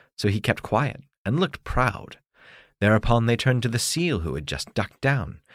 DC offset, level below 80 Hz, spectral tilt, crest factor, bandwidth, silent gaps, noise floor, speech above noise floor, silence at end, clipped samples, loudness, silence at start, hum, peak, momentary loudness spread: under 0.1%; -38 dBFS; -5 dB/octave; 18 dB; 15.5 kHz; 1.18-1.25 s; -52 dBFS; 29 dB; 0.15 s; under 0.1%; -24 LUFS; 0.2 s; none; -6 dBFS; 8 LU